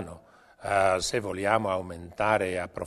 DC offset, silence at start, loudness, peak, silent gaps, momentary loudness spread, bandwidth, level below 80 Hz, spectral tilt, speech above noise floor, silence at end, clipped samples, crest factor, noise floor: under 0.1%; 0 s; -27 LUFS; -6 dBFS; none; 14 LU; 13.5 kHz; -54 dBFS; -4 dB/octave; 26 dB; 0 s; under 0.1%; 22 dB; -53 dBFS